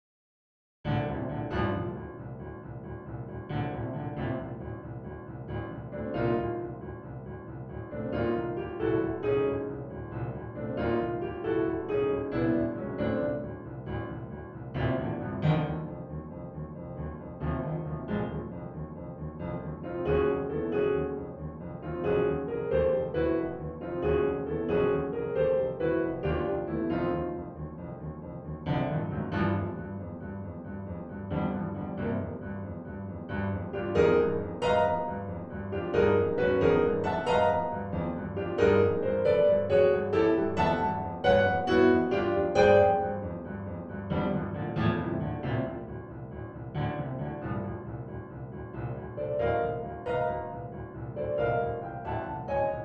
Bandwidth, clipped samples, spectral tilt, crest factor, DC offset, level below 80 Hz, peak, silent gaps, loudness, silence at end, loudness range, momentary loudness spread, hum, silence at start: 8.4 kHz; under 0.1%; -8.5 dB/octave; 20 dB; under 0.1%; -48 dBFS; -10 dBFS; none; -30 LUFS; 0 s; 10 LU; 15 LU; none; 0.85 s